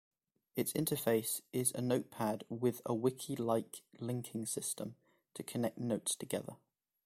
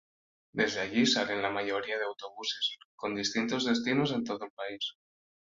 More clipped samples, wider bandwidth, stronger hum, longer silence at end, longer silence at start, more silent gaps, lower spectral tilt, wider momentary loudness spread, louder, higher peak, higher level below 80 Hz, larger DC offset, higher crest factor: neither; first, 16.5 kHz vs 7.6 kHz; neither; about the same, 0.5 s vs 0.5 s; about the same, 0.55 s vs 0.55 s; second, none vs 2.85-2.98 s, 4.50-4.57 s; about the same, -4.5 dB/octave vs -3.5 dB/octave; about the same, 11 LU vs 11 LU; second, -37 LUFS vs -31 LUFS; second, -18 dBFS vs -14 dBFS; about the same, -74 dBFS vs -70 dBFS; neither; about the same, 20 dB vs 18 dB